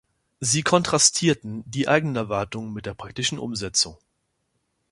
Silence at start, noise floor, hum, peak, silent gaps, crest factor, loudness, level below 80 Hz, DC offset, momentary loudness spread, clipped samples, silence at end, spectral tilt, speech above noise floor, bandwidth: 0.4 s; -74 dBFS; none; -2 dBFS; none; 22 dB; -22 LUFS; -54 dBFS; under 0.1%; 15 LU; under 0.1%; 0.95 s; -3 dB/octave; 50 dB; 11.5 kHz